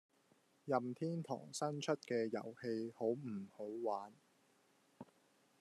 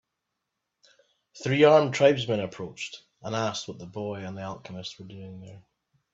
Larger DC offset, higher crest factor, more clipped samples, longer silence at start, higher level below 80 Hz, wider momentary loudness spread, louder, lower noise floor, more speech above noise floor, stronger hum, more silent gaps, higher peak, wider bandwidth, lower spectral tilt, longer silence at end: neither; about the same, 22 dB vs 22 dB; neither; second, 0.65 s vs 1.35 s; second, under -90 dBFS vs -70 dBFS; second, 18 LU vs 23 LU; second, -43 LUFS vs -25 LUFS; second, -75 dBFS vs -83 dBFS; second, 33 dB vs 57 dB; neither; neither; second, -22 dBFS vs -6 dBFS; first, 13 kHz vs 8 kHz; about the same, -5.5 dB/octave vs -5.5 dB/octave; about the same, 0.55 s vs 0.55 s